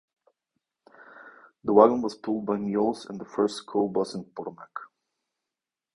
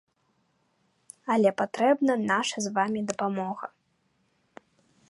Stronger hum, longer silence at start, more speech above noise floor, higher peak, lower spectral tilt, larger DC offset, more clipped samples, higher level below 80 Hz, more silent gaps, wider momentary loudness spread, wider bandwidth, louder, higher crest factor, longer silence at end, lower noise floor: neither; about the same, 1.15 s vs 1.25 s; first, 64 dB vs 46 dB; first, -2 dBFS vs -8 dBFS; first, -6.5 dB/octave vs -4.5 dB/octave; neither; neither; first, -68 dBFS vs -76 dBFS; neither; first, 20 LU vs 12 LU; about the same, 11 kHz vs 11.5 kHz; about the same, -26 LUFS vs -26 LUFS; about the same, 26 dB vs 22 dB; second, 1.1 s vs 1.45 s; first, -89 dBFS vs -71 dBFS